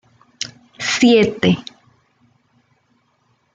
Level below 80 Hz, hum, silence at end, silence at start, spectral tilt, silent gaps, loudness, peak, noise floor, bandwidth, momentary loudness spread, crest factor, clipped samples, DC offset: -56 dBFS; none; 1.95 s; 0.4 s; -4.5 dB/octave; none; -17 LUFS; -2 dBFS; -63 dBFS; 9.2 kHz; 17 LU; 18 dB; under 0.1%; under 0.1%